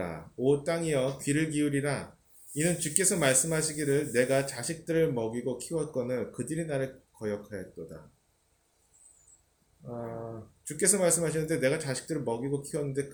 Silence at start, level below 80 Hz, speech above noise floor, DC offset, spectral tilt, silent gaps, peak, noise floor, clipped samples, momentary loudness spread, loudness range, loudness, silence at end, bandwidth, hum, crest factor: 0 s; -62 dBFS; 41 dB; under 0.1%; -4 dB/octave; none; -4 dBFS; -71 dBFS; under 0.1%; 16 LU; 15 LU; -29 LUFS; 0 s; over 20 kHz; none; 28 dB